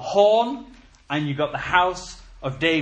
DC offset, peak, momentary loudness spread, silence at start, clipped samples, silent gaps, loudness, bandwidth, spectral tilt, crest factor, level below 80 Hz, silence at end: under 0.1%; -2 dBFS; 17 LU; 0 s; under 0.1%; none; -22 LUFS; 9 kHz; -5 dB/octave; 20 dB; -48 dBFS; 0 s